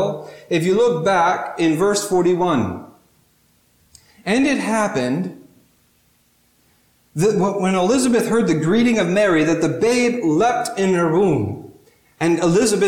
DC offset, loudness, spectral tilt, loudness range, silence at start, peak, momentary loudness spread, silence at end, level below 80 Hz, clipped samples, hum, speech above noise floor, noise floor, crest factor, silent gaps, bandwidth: under 0.1%; -18 LUFS; -5.5 dB/octave; 6 LU; 0 s; -6 dBFS; 8 LU; 0 s; -54 dBFS; under 0.1%; none; 42 dB; -60 dBFS; 12 dB; none; 16.5 kHz